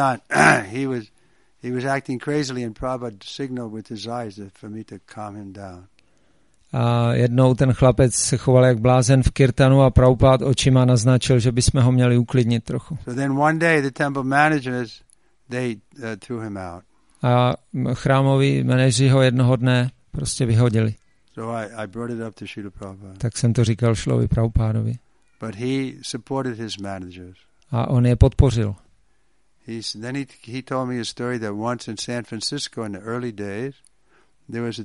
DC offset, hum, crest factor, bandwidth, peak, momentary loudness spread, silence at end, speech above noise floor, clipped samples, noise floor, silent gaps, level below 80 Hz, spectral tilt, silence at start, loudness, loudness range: 0.1%; none; 20 dB; 11.5 kHz; 0 dBFS; 18 LU; 0 s; 47 dB; under 0.1%; -67 dBFS; none; -36 dBFS; -6 dB/octave; 0 s; -20 LUFS; 12 LU